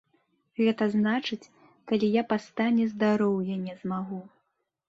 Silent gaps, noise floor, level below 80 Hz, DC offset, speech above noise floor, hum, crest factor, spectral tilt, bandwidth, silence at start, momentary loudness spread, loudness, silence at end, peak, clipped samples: none; -78 dBFS; -72 dBFS; under 0.1%; 51 dB; none; 16 dB; -7 dB/octave; 7.6 kHz; 0.6 s; 11 LU; -27 LUFS; 0.6 s; -12 dBFS; under 0.1%